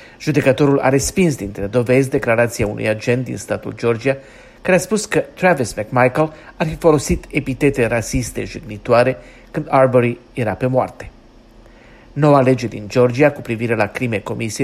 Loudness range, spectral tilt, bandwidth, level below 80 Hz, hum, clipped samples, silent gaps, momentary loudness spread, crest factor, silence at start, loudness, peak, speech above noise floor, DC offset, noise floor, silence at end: 2 LU; -6 dB/octave; 15 kHz; -40 dBFS; none; under 0.1%; none; 11 LU; 16 dB; 0 s; -17 LUFS; 0 dBFS; 28 dB; under 0.1%; -44 dBFS; 0 s